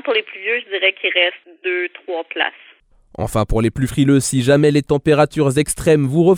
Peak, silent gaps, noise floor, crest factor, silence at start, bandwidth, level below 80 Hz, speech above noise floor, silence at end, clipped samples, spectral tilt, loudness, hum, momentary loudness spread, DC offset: -2 dBFS; none; -47 dBFS; 14 dB; 0.05 s; 19 kHz; -36 dBFS; 31 dB; 0 s; under 0.1%; -5 dB/octave; -17 LUFS; none; 9 LU; under 0.1%